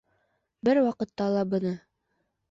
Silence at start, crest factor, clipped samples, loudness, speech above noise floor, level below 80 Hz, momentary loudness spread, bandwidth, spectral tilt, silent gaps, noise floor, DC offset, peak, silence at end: 0.65 s; 16 dB; under 0.1%; -27 LUFS; 51 dB; -68 dBFS; 9 LU; 7.6 kHz; -8 dB/octave; none; -77 dBFS; under 0.1%; -12 dBFS; 0.7 s